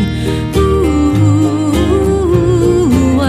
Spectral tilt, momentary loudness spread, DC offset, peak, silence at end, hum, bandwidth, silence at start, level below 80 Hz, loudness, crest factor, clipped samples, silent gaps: -7.5 dB/octave; 3 LU; under 0.1%; 0 dBFS; 0 s; none; 15.5 kHz; 0 s; -22 dBFS; -12 LUFS; 10 dB; under 0.1%; none